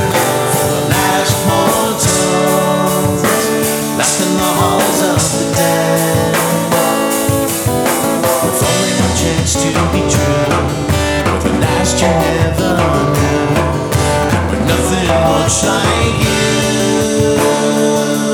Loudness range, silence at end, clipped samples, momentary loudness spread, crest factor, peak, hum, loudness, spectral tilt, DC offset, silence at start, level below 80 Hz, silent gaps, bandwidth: 1 LU; 0 s; under 0.1%; 2 LU; 12 dB; 0 dBFS; none; -13 LUFS; -4 dB/octave; under 0.1%; 0 s; -30 dBFS; none; 20 kHz